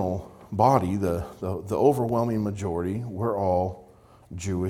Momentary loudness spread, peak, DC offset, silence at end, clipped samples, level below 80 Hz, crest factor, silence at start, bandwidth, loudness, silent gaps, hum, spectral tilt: 13 LU; -6 dBFS; under 0.1%; 0 s; under 0.1%; -54 dBFS; 20 dB; 0 s; 16 kHz; -26 LUFS; none; none; -8 dB/octave